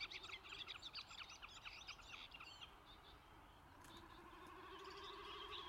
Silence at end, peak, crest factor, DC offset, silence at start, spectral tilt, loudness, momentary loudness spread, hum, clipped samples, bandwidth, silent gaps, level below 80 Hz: 0 s; -38 dBFS; 20 dB; under 0.1%; 0 s; -2 dB/octave; -55 LUFS; 12 LU; none; under 0.1%; 16 kHz; none; -72 dBFS